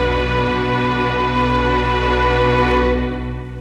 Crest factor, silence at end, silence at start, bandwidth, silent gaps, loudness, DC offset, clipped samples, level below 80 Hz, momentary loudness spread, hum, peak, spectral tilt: 12 dB; 0 s; 0 s; 9.6 kHz; none; -17 LUFS; under 0.1%; under 0.1%; -26 dBFS; 5 LU; none; -4 dBFS; -7 dB/octave